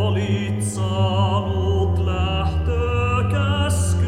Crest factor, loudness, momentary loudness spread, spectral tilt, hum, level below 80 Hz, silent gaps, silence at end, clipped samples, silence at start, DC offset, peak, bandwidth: 12 dB; -21 LUFS; 3 LU; -6 dB/octave; none; -30 dBFS; none; 0 s; under 0.1%; 0 s; under 0.1%; -8 dBFS; 13 kHz